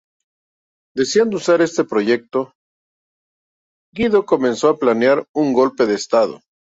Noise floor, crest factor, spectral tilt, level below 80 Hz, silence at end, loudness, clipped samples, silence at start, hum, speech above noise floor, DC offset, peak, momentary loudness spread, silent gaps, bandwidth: under -90 dBFS; 16 dB; -4.5 dB/octave; -56 dBFS; 0.35 s; -17 LUFS; under 0.1%; 0.95 s; none; over 74 dB; under 0.1%; -2 dBFS; 8 LU; 2.55-3.93 s, 5.29-5.34 s; 8 kHz